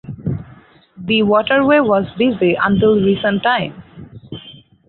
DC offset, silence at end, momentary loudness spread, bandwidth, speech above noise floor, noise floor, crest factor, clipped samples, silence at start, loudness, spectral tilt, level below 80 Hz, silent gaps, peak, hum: under 0.1%; 0.4 s; 19 LU; 4.4 kHz; 30 dB; -44 dBFS; 14 dB; under 0.1%; 0.1 s; -15 LUFS; -11 dB/octave; -46 dBFS; none; -2 dBFS; none